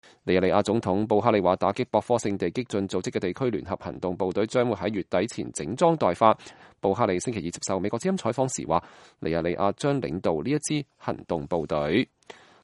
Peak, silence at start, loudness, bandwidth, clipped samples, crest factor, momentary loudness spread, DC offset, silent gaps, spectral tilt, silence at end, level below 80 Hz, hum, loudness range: -4 dBFS; 0.25 s; -26 LUFS; 11.5 kHz; under 0.1%; 22 dB; 9 LU; under 0.1%; none; -5.5 dB/octave; 0.3 s; -56 dBFS; none; 3 LU